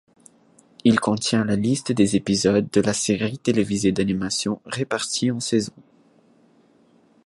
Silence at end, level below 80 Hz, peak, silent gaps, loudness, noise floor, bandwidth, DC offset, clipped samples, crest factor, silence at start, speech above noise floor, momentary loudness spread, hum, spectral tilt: 1.45 s; -54 dBFS; -4 dBFS; none; -22 LUFS; -57 dBFS; 11.5 kHz; under 0.1%; under 0.1%; 20 dB; 0.85 s; 36 dB; 5 LU; none; -4.5 dB/octave